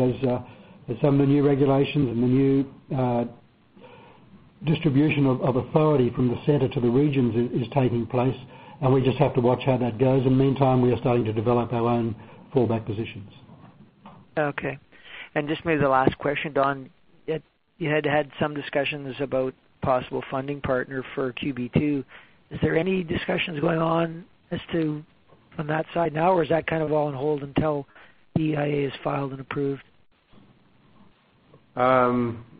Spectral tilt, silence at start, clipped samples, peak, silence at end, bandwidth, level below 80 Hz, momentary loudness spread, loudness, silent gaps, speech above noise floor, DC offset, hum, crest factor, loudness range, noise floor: -6.5 dB/octave; 0 s; under 0.1%; -4 dBFS; 0.15 s; 4.9 kHz; -50 dBFS; 12 LU; -24 LUFS; none; 34 dB; under 0.1%; none; 20 dB; 6 LU; -57 dBFS